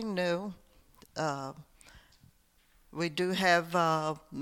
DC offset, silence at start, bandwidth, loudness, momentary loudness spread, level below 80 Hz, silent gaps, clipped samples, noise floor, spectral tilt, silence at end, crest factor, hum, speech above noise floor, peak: under 0.1%; 0 s; 17.5 kHz; -31 LUFS; 18 LU; -66 dBFS; none; under 0.1%; -66 dBFS; -5 dB/octave; 0 s; 20 dB; none; 35 dB; -12 dBFS